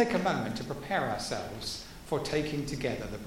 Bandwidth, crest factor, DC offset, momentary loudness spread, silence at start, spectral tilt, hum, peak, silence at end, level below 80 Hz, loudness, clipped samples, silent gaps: 16.5 kHz; 18 dB; under 0.1%; 7 LU; 0 s; -5 dB/octave; none; -14 dBFS; 0 s; -50 dBFS; -33 LUFS; under 0.1%; none